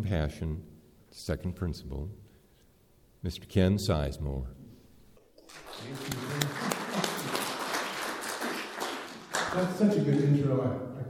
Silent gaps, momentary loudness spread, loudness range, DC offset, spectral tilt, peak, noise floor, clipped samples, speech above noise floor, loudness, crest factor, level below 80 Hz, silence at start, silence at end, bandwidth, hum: none; 15 LU; 6 LU; under 0.1%; -5.5 dB/octave; -6 dBFS; -62 dBFS; under 0.1%; 33 dB; -31 LUFS; 26 dB; -46 dBFS; 0 s; 0 s; 19 kHz; none